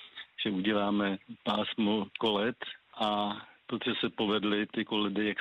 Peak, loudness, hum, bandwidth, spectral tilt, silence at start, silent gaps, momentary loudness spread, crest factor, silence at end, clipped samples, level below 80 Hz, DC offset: -16 dBFS; -31 LUFS; none; 8 kHz; -6.5 dB/octave; 0 s; none; 8 LU; 14 dB; 0 s; under 0.1%; -68 dBFS; under 0.1%